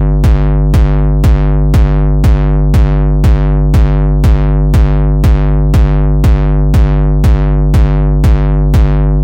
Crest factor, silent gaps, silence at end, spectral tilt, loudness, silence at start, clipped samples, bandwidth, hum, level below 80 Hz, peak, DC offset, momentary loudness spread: 8 dB; none; 0 s; -8.5 dB/octave; -10 LUFS; 0 s; under 0.1%; 7 kHz; none; -10 dBFS; 0 dBFS; under 0.1%; 1 LU